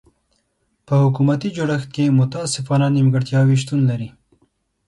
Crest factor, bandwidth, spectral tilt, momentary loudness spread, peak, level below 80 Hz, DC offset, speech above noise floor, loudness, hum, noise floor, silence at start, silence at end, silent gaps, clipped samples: 14 dB; 11.5 kHz; -6.5 dB/octave; 6 LU; -6 dBFS; -56 dBFS; under 0.1%; 51 dB; -18 LUFS; none; -68 dBFS; 0.9 s; 0.8 s; none; under 0.1%